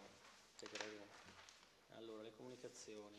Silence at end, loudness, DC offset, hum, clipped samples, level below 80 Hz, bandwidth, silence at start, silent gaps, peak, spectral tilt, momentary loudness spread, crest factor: 0 s; -57 LUFS; under 0.1%; none; under 0.1%; -88 dBFS; 13 kHz; 0 s; none; -30 dBFS; -2.5 dB/octave; 12 LU; 28 dB